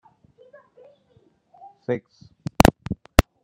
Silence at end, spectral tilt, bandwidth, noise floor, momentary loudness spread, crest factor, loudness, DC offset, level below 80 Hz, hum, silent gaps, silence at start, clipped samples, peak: 0.25 s; -5.5 dB/octave; 11 kHz; -61 dBFS; 19 LU; 24 dB; -22 LUFS; under 0.1%; -32 dBFS; none; none; 1.9 s; under 0.1%; 0 dBFS